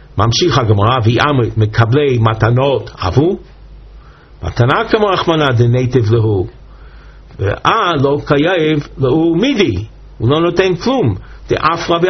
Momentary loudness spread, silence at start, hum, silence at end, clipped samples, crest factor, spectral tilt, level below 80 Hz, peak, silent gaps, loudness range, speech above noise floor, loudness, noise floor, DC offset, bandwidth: 8 LU; 0.15 s; none; 0 s; under 0.1%; 14 dB; -5.5 dB/octave; -36 dBFS; 0 dBFS; none; 2 LU; 25 dB; -13 LUFS; -38 dBFS; under 0.1%; 6.4 kHz